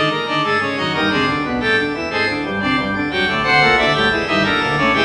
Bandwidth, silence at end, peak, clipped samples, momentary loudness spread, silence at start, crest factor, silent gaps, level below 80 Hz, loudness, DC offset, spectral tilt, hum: 11 kHz; 0 s; -2 dBFS; under 0.1%; 6 LU; 0 s; 16 dB; none; -42 dBFS; -16 LUFS; under 0.1%; -5 dB/octave; none